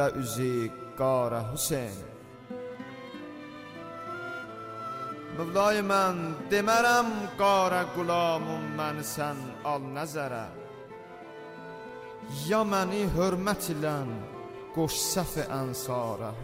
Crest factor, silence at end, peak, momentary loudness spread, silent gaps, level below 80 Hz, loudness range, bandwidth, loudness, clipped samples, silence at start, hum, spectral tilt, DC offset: 18 dB; 0 s; -12 dBFS; 18 LU; none; -54 dBFS; 11 LU; 16 kHz; -29 LUFS; under 0.1%; 0 s; none; -4.5 dB/octave; under 0.1%